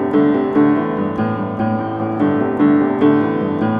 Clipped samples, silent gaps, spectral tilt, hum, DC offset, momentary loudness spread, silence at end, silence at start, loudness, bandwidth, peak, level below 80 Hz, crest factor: under 0.1%; none; -10 dB/octave; none; under 0.1%; 6 LU; 0 s; 0 s; -16 LUFS; 4.6 kHz; -2 dBFS; -52 dBFS; 14 dB